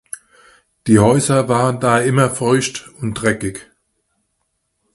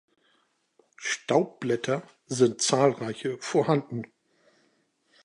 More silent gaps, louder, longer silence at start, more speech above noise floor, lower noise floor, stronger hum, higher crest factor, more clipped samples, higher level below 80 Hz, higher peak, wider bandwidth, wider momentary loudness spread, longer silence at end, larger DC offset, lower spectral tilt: neither; first, -16 LUFS vs -27 LUFS; second, 0.85 s vs 1 s; first, 55 dB vs 44 dB; about the same, -70 dBFS vs -70 dBFS; neither; about the same, 18 dB vs 22 dB; neither; first, -46 dBFS vs -76 dBFS; first, 0 dBFS vs -8 dBFS; about the same, 12 kHz vs 11.5 kHz; about the same, 15 LU vs 13 LU; about the same, 1.3 s vs 1.2 s; neither; about the same, -5.5 dB/octave vs -4.5 dB/octave